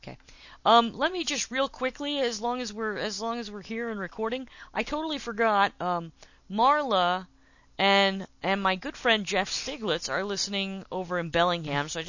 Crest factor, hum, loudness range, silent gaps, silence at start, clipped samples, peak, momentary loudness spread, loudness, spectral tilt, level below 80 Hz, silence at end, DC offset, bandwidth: 22 dB; none; 5 LU; none; 0.05 s; under 0.1%; -6 dBFS; 11 LU; -27 LUFS; -3.5 dB/octave; -58 dBFS; 0 s; under 0.1%; 7.4 kHz